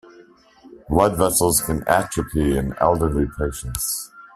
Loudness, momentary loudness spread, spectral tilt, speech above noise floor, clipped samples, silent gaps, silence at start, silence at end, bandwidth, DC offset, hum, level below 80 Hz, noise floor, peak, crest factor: -20 LUFS; 8 LU; -4.5 dB/octave; 30 dB; under 0.1%; none; 0.2 s; 0.1 s; 16 kHz; under 0.1%; none; -34 dBFS; -50 dBFS; 0 dBFS; 20 dB